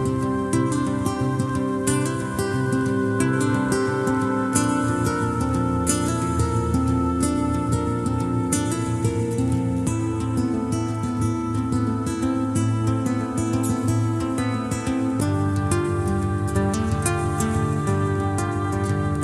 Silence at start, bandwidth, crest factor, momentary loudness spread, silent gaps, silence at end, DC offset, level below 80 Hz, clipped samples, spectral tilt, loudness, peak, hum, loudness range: 0 s; 13.5 kHz; 20 dB; 3 LU; none; 0 s; under 0.1%; -38 dBFS; under 0.1%; -6 dB/octave; -23 LUFS; -2 dBFS; none; 2 LU